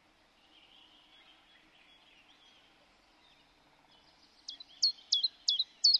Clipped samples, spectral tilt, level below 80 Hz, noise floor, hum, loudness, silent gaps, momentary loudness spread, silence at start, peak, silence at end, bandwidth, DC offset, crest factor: under 0.1%; 3 dB/octave; -80 dBFS; -67 dBFS; none; -30 LUFS; none; 20 LU; 4.5 s; -14 dBFS; 0 s; 11 kHz; under 0.1%; 24 dB